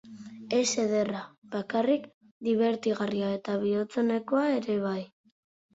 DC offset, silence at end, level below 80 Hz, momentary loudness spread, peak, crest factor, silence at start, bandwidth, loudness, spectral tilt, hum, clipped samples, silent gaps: under 0.1%; 0.7 s; -72 dBFS; 11 LU; -14 dBFS; 16 dB; 0.05 s; 8 kHz; -29 LUFS; -4.5 dB/octave; none; under 0.1%; 1.38-1.42 s, 2.14-2.21 s, 2.31-2.40 s